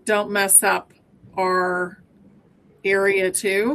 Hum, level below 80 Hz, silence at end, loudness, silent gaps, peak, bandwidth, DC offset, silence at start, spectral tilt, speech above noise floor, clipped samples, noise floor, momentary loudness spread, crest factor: none; -64 dBFS; 0 s; -19 LUFS; none; -2 dBFS; 13.5 kHz; under 0.1%; 0.05 s; -2 dB/octave; 35 dB; under 0.1%; -54 dBFS; 13 LU; 20 dB